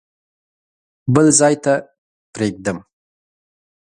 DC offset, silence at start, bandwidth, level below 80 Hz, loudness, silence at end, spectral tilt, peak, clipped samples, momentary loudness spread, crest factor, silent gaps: under 0.1%; 1.05 s; 11 kHz; -54 dBFS; -16 LUFS; 1.1 s; -4.5 dB/octave; 0 dBFS; under 0.1%; 17 LU; 20 dB; 1.98-2.33 s